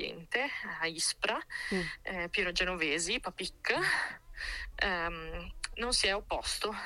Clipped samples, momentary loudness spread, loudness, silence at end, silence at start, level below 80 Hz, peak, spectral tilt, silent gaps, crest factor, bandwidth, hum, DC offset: under 0.1%; 10 LU; -33 LUFS; 0 s; 0 s; -50 dBFS; -14 dBFS; -2 dB/octave; none; 20 dB; 16.5 kHz; none; under 0.1%